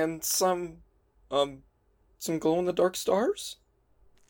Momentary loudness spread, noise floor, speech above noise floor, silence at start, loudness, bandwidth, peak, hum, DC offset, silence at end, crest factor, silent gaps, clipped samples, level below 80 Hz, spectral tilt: 13 LU; -67 dBFS; 39 dB; 0 s; -28 LUFS; 18 kHz; -12 dBFS; none; under 0.1%; 0.75 s; 18 dB; none; under 0.1%; -62 dBFS; -3.5 dB/octave